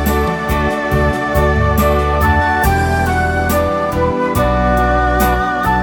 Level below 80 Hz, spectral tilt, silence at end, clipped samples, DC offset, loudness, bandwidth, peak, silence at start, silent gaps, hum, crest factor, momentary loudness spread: -20 dBFS; -6 dB/octave; 0 s; under 0.1%; under 0.1%; -14 LUFS; 19.5 kHz; 0 dBFS; 0 s; none; none; 14 dB; 3 LU